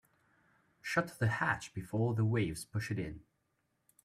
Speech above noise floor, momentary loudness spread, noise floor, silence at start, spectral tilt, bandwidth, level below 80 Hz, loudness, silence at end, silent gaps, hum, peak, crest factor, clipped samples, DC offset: 46 dB; 10 LU; -80 dBFS; 0.85 s; -6 dB/octave; 14 kHz; -62 dBFS; -35 LUFS; 0.85 s; none; none; -18 dBFS; 20 dB; under 0.1%; under 0.1%